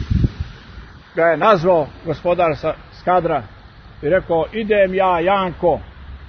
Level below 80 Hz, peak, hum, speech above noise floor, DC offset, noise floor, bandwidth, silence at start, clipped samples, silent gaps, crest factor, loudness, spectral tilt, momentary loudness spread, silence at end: -34 dBFS; -2 dBFS; none; 22 dB; under 0.1%; -38 dBFS; 6.4 kHz; 0 s; under 0.1%; none; 18 dB; -18 LUFS; -8 dB/octave; 12 LU; 0 s